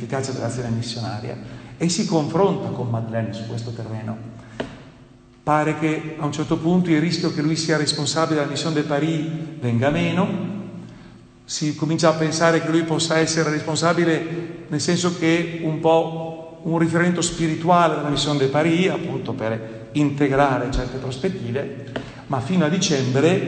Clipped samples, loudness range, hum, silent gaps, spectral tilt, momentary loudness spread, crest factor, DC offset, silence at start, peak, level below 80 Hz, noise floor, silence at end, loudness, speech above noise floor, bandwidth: under 0.1%; 4 LU; none; none; -5 dB/octave; 12 LU; 18 dB; under 0.1%; 0 s; -2 dBFS; -46 dBFS; -48 dBFS; 0 s; -21 LUFS; 27 dB; 9.2 kHz